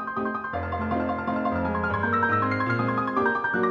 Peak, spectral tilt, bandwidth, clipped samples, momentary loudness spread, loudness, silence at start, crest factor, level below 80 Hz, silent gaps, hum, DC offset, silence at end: -12 dBFS; -8.5 dB/octave; 7 kHz; under 0.1%; 6 LU; -25 LUFS; 0 s; 14 dB; -50 dBFS; none; none; under 0.1%; 0 s